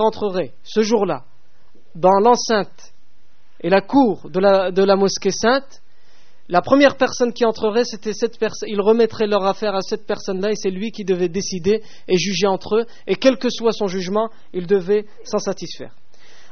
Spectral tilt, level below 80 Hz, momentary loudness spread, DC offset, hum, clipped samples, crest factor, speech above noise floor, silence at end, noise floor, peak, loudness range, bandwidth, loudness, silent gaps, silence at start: -4 dB/octave; -56 dBFS; 10 LU; 3%; none; under 0.1%; 18 dB; 38 dB; 0.65 s; -57 dBFS; 0 dBFS; 3 LU; 6.8 kHz; -19 LUFS; none; 0 s